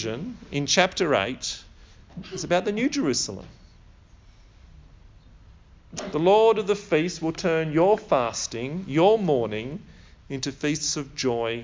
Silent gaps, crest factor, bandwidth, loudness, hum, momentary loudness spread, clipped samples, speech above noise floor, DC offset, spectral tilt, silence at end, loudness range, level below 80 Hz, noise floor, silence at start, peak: none; 22 dB; 7.6 kHz; -24 LUFS; none; 16 LU; under 0.1%; 28 dB; under 0.1%; -4 dB/octave; 0 s; 6 LU; -52 dBFS; -51 dBFS; 0 s; -4 dBFS